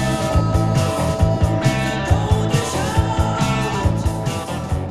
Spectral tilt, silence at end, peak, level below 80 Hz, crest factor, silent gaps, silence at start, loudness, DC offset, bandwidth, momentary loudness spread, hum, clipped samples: -6 dB/octave; 0 s; -2 dBFS; -28 dBFS; 16 dB; none; 0 s; -19 LUFS; under 0.1%; 14 kHz; 5 LU; none; under 0.1%